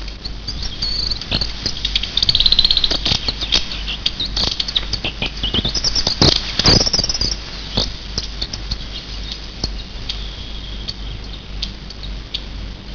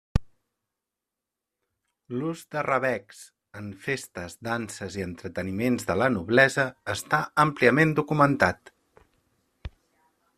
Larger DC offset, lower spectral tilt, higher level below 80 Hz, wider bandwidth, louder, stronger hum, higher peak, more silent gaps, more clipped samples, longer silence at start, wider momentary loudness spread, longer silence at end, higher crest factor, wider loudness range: first, 0.4% vs under 0.1%; second, -3 dB/octave vs -5.5 dB/octave; first, -28 dBFS vs -46 dBFS; second, 5.4 kHz vs 14.5 kHz; first, -17 LUFS vs -25 LUFS; neither; first, 0 dBFS vs -4 dBFS; neither; neither; second, 0 s vs 0.15 s; about the same, 18 LU vs 20 LU; second, 0 s vs 0.7 s; about the same, 20 dB vs 24 dB; first, 13 LU vs 9 LU